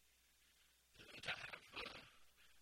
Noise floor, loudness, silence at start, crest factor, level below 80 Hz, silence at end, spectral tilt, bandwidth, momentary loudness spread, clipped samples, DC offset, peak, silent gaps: -75 dBFS; -51 LUFS; 0 s; 24 dB; -78 dBFS; 0 s; -2 dB/octave; 16.5 kHz; 20 LU; under 0.1%; under 0.1%; -32 dBFS; none